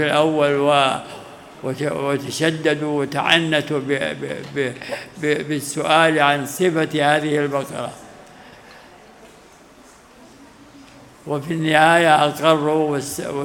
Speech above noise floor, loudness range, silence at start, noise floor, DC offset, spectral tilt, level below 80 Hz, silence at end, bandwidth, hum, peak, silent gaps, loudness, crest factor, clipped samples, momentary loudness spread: 28 dB; 10 LU; 0 s; -47 dBFS; under 0.1%; -4.5 dB/octave; -60 dBFS; 0 s; 18 kHz; none; 0 dBFS; none; -19 LUFS; 20 dB; under 0.1%; 14 LU